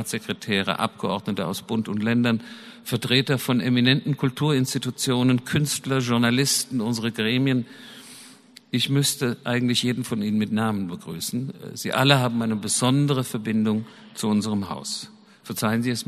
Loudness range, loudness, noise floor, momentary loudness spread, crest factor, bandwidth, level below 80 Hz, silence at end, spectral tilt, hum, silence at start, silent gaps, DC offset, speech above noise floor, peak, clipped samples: 3 LU; -23 LUFS; -49 dBFS; 11 LU; 24 dB; 13.5 kHz; -62 dBFS; 0.05 s; -4.5 dB/octave; none; 0 s; none; under 0.1%; 26 dB; 0 dBFS; under 0.1%